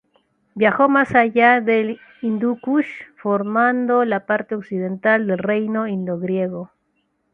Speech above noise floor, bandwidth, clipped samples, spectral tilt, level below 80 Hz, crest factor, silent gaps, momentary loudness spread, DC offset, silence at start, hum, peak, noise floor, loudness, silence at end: 50 dB; 4.7 kHz; under 0.1%; -8.5 dB/octave; -62 dBFS; 18 dB; none; 12 LU; under 0.1%; 0.55 s; none; -2 dBFS; -68 dBFS; -19 LUFS; 0.65 s